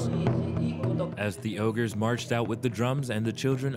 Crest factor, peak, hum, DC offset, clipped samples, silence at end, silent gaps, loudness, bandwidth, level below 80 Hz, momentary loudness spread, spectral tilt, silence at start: 16 dB; -12 dBFS; none; under 0.1%; under 0.1%; 0 s; none; -29 LUFS; 15.5 kHz; -60 dBFS; 3 LU; -6.5 dB/octave; 0 s